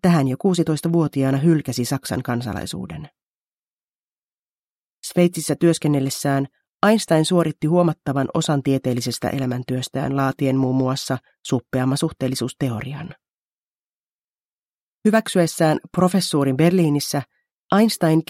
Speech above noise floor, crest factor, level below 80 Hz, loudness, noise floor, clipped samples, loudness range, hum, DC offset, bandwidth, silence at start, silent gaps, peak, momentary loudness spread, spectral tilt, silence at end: over 70 dB; 20 dB; -56 dBFS; -20 LUFS; under -90 dBFS; under 0.1%; 7 LU; none; under 0.1%; 16 kHz; 0.05 s; 3.23-5.03 s, 6.69-6.80 s, 13.33-15.02 s, 17.52-17.67 s; -2 dBFS; 10 LU; -6 dB/octave; 0.05 s